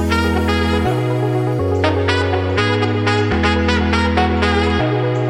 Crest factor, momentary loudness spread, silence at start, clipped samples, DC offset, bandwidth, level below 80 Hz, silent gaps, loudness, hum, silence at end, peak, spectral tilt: 14 dB; 2 LU; 0 s; under 0.1%; under 0.1%; 13 kHz; -28 dBFS; none; -16 LUFS; none; 0 s; -2 dBFS; -6.5 dB/octave